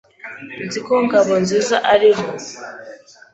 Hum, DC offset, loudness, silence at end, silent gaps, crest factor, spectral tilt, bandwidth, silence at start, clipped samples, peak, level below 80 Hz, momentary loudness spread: none; under 0.1%; -16 LUFS; 0.4 s; none; 16 dB; -4 dB/octave; 8.2 kHz; 0.25 s; under 0.1%; -2 dBFS; -58 dBFS; 21 LU